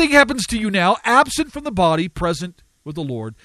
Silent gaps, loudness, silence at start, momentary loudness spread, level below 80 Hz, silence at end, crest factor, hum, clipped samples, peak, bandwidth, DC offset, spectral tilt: none; -18 LUFS; 0 s; 14 LU; -42 dBFS; 0.1 s; 18 dB; none; under 0.1%; 0 dBFS; 14 kHz; under 0.1%; -4 dB/octave